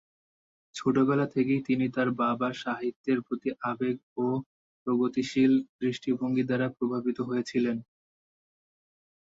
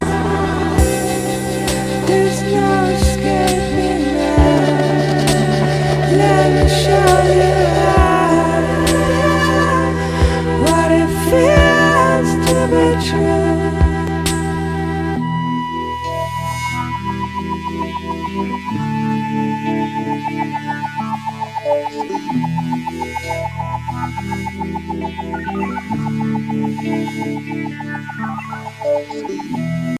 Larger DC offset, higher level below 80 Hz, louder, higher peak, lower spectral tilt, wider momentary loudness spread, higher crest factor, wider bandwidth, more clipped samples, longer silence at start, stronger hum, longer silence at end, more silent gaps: neither; second, -70 dBFS vs -26 dBFS; second, -29 LUFS vs -16 LUFS; second, -12 dBFS vs 0 dBFS; first, -7 dB/octave vs -5.5 dB/octave; second, 8 LU vs 11 LU; about the same, 16 dB vs 16 dB; second, 7.8 kHz vs 16 kHz; neither; first, 0.75 s vs 0 s; neither; first, 1.55 s vs 0 s; first, 2.96-3.04 s, 4.03-4.16 s, 4.46-4.86 s, 5.69-5.79 s vs none